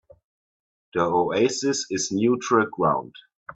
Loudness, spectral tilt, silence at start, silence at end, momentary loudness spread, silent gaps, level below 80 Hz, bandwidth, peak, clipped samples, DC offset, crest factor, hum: -23 LUFS; -4 dB/octave; 0.95 s; 0.05 s; 7 LU; 3.35-3.46 s; -64 dBFS; 8.4 kHz; -6 dBFS; under 0.1%; under 0.1%; 18 dB; none